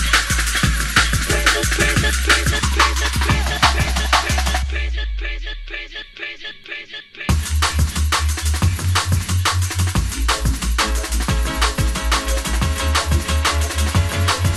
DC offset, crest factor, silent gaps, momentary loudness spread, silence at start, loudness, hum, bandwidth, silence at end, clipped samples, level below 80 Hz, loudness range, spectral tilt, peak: under 0.1%; 18 dB; none; 13 LU; 0 s; -18 LUFS; none; 15 kHz; 0 s; under 0.1%; -22 dBFS; 6 LU; -3 dB/octave; 0 dBFS